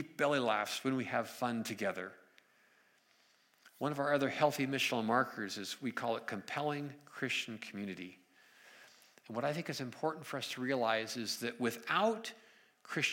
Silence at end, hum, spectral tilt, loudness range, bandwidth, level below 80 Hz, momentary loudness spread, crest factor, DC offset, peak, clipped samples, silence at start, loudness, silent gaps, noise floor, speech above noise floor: 0 s; none; -4 dB/octave; 6 LU; 16.5 kHz; -88 dBFS; 11 LU; 20 dB; under 0.1%; -16 dBFS; under 0.1%; 0 s; -36 LUFS; none; -70 dBFS; 34 dB